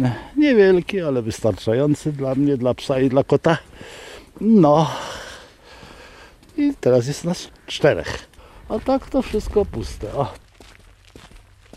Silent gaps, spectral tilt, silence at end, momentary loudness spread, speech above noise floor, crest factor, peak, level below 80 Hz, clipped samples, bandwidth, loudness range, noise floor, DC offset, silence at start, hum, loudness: none; -6.5 dB/octave; 0.4 s; 18 LU; 29 dB; 16 dB; -4 dBFS; -42 dBFS; under 0.1%; 14 kHz; 6 LU; -48 dBFS; under 0.1%; 0 s; none; -20 LUFS